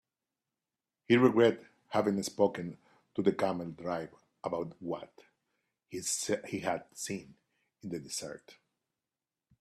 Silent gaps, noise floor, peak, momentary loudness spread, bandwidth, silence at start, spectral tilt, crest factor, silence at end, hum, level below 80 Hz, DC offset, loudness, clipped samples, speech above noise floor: none; under -90 dBFS; -10 dBFS; 18 LU; 14 kHz; 1.1 s; -4.5 dB/octave; 24 dB; 1.1 s; none; -74 dBFS; under 0.1%; -33 LUFS; under 0.1%; over 58 dB